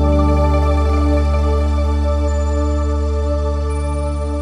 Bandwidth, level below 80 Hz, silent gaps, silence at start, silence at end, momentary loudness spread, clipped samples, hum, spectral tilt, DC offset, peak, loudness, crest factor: 10 kHz; -18 dBFS; none; 0 s; 0 s; 6 LU; under 0.1%; none; -8 dB/octave; under 0.1%; -4 dBFS; -17 LUFS; 12 dB